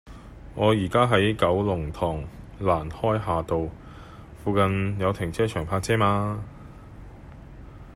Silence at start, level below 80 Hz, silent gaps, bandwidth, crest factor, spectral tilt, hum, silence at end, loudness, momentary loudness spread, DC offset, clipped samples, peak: 0.05 s; -44 dBFS; none; 15 kHz; 20 dB; -6.5 dB/octave; none; 0 s; -25 LUFS; 24 LU; under 0.1%; under 0.1%; -6 dBFS